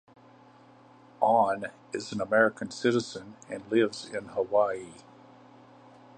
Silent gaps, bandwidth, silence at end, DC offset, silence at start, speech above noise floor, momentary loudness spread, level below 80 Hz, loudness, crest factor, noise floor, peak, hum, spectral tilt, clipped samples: none; 10 kHz; 1.25 s; under 0.1%; 1.2 s; 27 dB; 15 LU; -72 dBFS; -28 LUFS; 22 dB; -55 dBFS; -8 dBFS; none; -5 dB/octave; under 0.1%